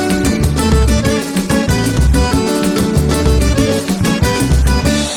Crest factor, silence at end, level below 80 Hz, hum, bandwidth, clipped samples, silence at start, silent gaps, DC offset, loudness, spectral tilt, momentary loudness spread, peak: 10 dB; 0 s; -18 dBFS; none; 18 kHz; under 0.1%; 0 s; none; under 0.1%; -13 LUFS; -5.5 dB/octave; 2 LU; -2 dBFS